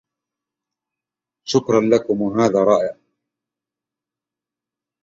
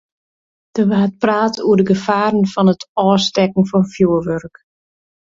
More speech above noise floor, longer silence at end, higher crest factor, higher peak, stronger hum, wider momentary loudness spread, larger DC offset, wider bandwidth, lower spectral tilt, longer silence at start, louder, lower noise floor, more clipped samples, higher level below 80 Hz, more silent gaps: second, 71 dB vs over 75 dB; first, 2.1 s vs 0.8 s; about the same, 20 dB vs 16 dB; about the same, -2 dBFS vs 0 dBFS; neither; about the same, 7 LU vs 5 LU; neither; about the same, 7.8 kHz vs 7.6 kHz; about the same, -6 dB/octave vs -6.5 dB/octave; first, 1.45 s vs 0.75 s; second, -18 LUFS vs -15 LUFS; about the same, -88 dBFS vs under -90 dBFS; neither; second, -60 dBFS vs -52 dBFS; second, none vs 2.89-2.95 s